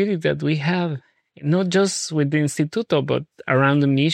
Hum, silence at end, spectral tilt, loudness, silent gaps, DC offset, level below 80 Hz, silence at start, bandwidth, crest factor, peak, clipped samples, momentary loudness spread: none; 0 s; -5.5 dB/octave; -21 LUFS; none; under 0.1%; -64 dBFS; 0 s; 13 kHz; 16 dB; -4 dBFS; under 0.1%; 8 LU